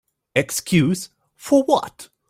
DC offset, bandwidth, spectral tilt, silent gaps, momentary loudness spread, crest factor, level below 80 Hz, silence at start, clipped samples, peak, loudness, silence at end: under 0.1%; 16 kHz; -5 dB/octave; none; 19 LU; 18 dB; -56 dBFS; 0.35 s; under 0.1%; -2 dBFS; -20 LUFS; 0.25 s